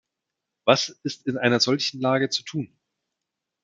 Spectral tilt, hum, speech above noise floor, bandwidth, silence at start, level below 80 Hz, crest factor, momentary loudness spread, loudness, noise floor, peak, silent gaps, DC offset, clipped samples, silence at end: -4 dB/octave; none; 61 dB; 9.2 kHz; 0.65 s; -72 dBFS; 24 dB; 11 LU; -23 LUFS; -84 dBFS; -2 dBFS; none; under 0.1%; under 0.1%; 1 s